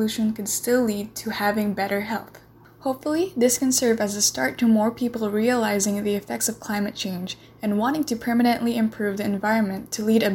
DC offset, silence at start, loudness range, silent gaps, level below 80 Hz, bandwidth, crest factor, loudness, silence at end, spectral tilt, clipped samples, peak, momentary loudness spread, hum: under 0.1%; 0 s; 3 LU; none; -58 dBFS; 17 kHz; 16 dB; -23 LUFS; 0 s; -4 dB/octave; under 0.1%; -6 dBFS; 9 LU; none